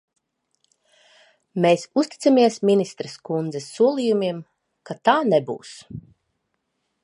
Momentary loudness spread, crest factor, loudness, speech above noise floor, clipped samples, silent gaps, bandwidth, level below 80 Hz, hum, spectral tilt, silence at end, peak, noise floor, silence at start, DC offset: 19 LU; 20 dB; -21 LUFS; 54 dB; under 0.1%; none; 11.5 kHz; -66 dBFS; none; -5.5 dB/octave; 1.05 s; -4 dBFS; -75 dBFS; 1.55 s; under 0.1%